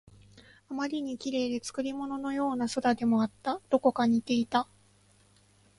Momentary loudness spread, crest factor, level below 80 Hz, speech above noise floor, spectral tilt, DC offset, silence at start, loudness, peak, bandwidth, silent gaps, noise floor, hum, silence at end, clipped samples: 8 LU; 20 dB; -68 dBFS; 34 dB; -5 dB/octave; under 0.1%; 0.35 s; -30 LUFS; -12 dBFS; 11.5 kHz; none; -63 dBFS; 50 Hz at -60 dBFS; 1.15 s; under 0.1%